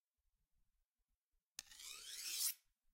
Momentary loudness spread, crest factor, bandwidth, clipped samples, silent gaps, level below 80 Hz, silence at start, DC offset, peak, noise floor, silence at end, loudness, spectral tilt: 16 LU; 26 dB; 16.5 kHz; under 0.1%; none; -84 dBFS; 1.6 s; under 0.1%; -26 dBFS; under -90 dBFS; 0.35 s; -45 LUFS; 4 dB/octave